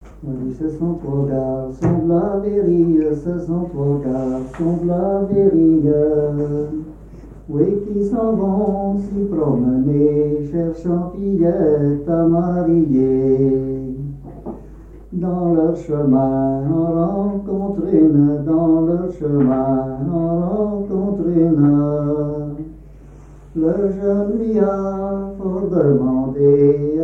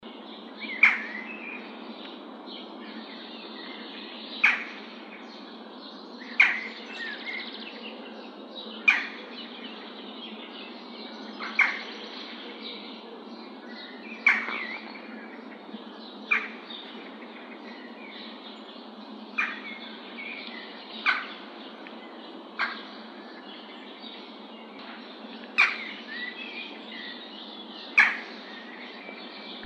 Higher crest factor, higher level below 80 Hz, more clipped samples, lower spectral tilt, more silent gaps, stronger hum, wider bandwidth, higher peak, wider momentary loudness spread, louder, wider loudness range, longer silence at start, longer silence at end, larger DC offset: second, 14 dB vs 28 dB; first, -40 dBFS vs under -90 dBFS; neither; first, -12 dB/octave vs -3 dB/octave; neither; neither; second, 2.7 kHz vs 9.2 kHz; about the same, -4 dBFS vs -6 dBFS; second, 10 LU vs 20 LU; first, -18 LUFS vs -29 LUFS; second, 3 LU vs 9 LU; about the same, 0 s vs 0 s; about the same, 0 s vs 0 s; neither